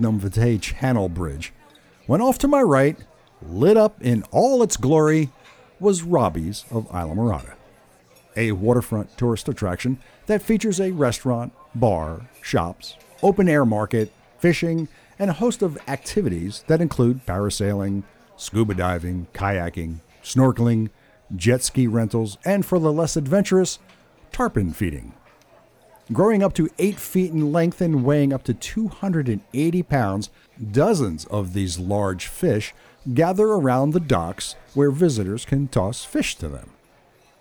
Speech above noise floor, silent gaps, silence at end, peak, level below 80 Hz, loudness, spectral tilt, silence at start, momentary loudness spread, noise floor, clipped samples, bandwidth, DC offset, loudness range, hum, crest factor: 35 dB; none; 0.75 s; -6 dBFS; -42 dBFS; -21 LUFS; -6.5 dB/octave; 0 s; 12 LU; -56 dBFS; under 0.1%; over 20 kHz; under 0.1%; 4 LU; none; 14 dB